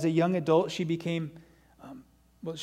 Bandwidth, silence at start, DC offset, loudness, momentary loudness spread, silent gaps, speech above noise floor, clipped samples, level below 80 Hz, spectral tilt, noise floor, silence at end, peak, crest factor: 12.5 kHz; 0 s; under 0.1%; -28 LUFS; 23 LU; none; 26 dB; under 0.1%; -66 dBFS; -6.5 dB/octave; -53 dBFS; 0 s; -12 dBFS; 18 dB